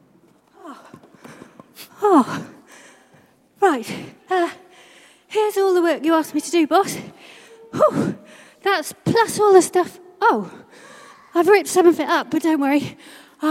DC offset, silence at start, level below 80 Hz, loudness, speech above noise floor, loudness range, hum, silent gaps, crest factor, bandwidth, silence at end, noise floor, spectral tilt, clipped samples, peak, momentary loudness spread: under 0.1%; 0.65 s; -68 dBFS; -19 LUFS; 37 dB; 7 LU; none; none; 20 dB; 16 kHz; 0 s; -55 dBFS; -4.5 dB/octave; under 0.1%; 0 dBFS; 17 LU